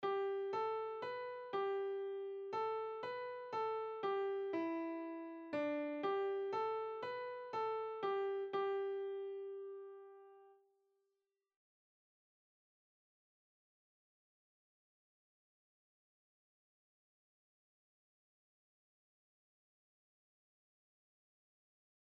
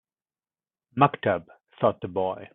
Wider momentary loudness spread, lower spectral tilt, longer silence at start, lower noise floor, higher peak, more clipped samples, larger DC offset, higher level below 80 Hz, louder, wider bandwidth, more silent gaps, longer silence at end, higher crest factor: about the same, 8 LU vs 8 LU; second, -2.5 dB/octave vs -11 dB/octave; second, 0 s vs 0.95 s; about the same, -89 dBFS vs under -90 dBFS; second, -28 dBFS vs -6 dBFS; neither; neither; second, under -90 dBFS vs -66 dBFS; second, -42 LUFS vs -26 LUFS; first, 6.4 kHz vs 4 kHz; neither; first, 11.5 s vs 0.05 s; about the same, 18 dB vs 22 dB